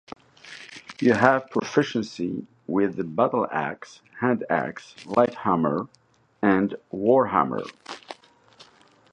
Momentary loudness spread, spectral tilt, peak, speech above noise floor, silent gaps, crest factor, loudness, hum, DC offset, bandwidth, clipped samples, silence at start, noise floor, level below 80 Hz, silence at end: 21 LU; -6.5 dB/octave; -2 dBFS; 32 dB; none; 24 dB; -24 LUFS; none; under 0.1%; 9.4 kHz; under 0.1%; 0.45 s; -56 dBFS; -62 dBFS; 1 s